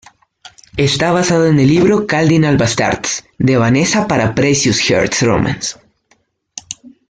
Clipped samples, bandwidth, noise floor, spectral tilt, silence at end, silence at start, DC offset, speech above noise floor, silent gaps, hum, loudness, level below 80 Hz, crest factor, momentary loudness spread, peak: under 0.1%; 9.6 kHz; -58 dBFS; -4.5 dB/octave; 0.2 s; 0.45 s; under 0.1%; 45 dB; none; none; -13 LUFS; -42 dBFS; 12 dB; 13 LU; -2 dBFS